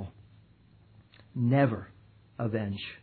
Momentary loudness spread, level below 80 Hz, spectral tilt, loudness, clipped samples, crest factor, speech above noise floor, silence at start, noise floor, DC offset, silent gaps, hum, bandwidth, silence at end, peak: 22 LU; -64 dBFS; -11 dB/octave; -30 LUFS; under 0.1%; 20 dB; 31 dB; 0 s; -59 dBFS; under 0.1%; none; none; 4.5 kHz; 0.05 s; -12 dBFS